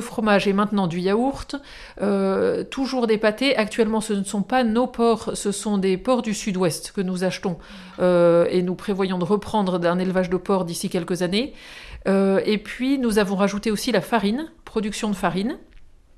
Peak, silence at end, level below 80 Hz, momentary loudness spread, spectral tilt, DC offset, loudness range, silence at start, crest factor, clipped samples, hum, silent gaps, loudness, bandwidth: -6 dBFS; 0.3 s; -48 dBFS; 9 LU; -5.5 dB/octave; under 0.1%; 2 LU; 0 s; 16 dB; under 0.1%; none; none; -22 LUFS; 14 kHz